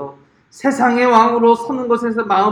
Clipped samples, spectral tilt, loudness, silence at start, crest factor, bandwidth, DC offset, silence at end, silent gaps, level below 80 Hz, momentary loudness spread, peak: under 0.1%; -5 dB/octave; -15 LUFS; 0 s; 14 dB; 11.5 kHz; under 0.1%; 0 s; none; -60 dBFS; 9 LU; 0 dBFS